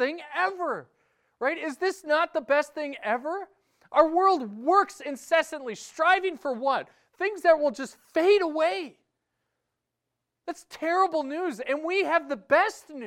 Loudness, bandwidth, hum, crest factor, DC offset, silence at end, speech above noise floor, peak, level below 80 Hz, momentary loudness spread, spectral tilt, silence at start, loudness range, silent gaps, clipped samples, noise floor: -26 LUFS; 15 kHz; none; 20 dB; under 0.1%; 0 s; 58 dB; -8 dBFS; -72 dBFS; 14 LU; -3 dB/octave; 0 s; 4 LU; none; under 0.1%; -84 dBFS